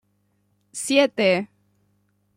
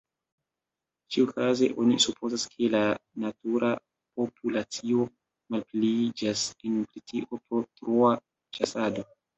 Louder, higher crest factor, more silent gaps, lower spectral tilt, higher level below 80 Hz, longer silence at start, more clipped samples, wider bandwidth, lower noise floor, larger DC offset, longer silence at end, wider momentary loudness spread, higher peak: first, -21 LUFS vs -28 LUFS; about the same, 20 dB vs 20 dB; neither; about the same, -3.5 dB/octave vs -4 dB/octave; about the same, -72 dBFS vs -68 dBFS; second, 0.75 s vs 1.1 s; neither; first, 15.5 kHz vs 8.4 kHz; second, -68 dBFS vs -89 dBFS; neither; first, 0.9 s vs 0.35 s; first, 19 LU vs 11 LU; first, -4 dBFS vs -8 dBFS